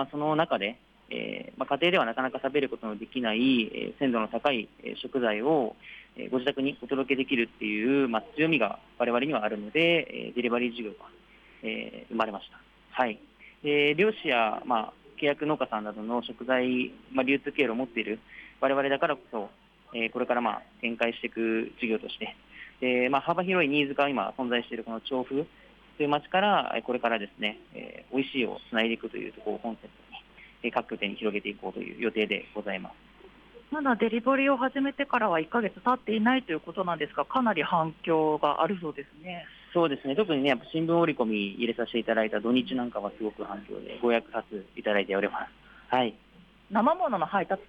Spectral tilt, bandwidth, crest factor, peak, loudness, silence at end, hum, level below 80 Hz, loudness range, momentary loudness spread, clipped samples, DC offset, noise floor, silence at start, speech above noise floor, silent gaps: -7 dB/octave; 6.2 kHz; 18 dB; -12 dBFS; -28 LUFS; 0.05 s; none; -66 dBFS; 5 LU; 13 LU; under 0.1%; under 0.1%; -54 dBFS; 0 s; 25 dB; none